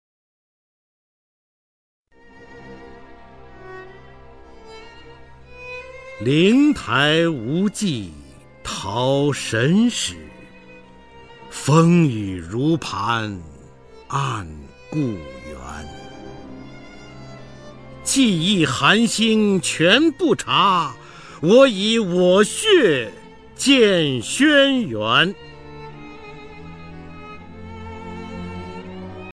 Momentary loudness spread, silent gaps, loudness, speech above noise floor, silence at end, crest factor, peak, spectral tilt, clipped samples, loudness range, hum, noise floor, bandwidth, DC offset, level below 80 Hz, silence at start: 24 LU; none; -18 LUFS; 29 dB; 0 s; 20 dB; 0 dBFS; -4.5 dB/octave; under 0.1%; 16 LU; none; -46 dBFS; 13.5 kHz; 0.3%; -50 dBFS; 2.5 s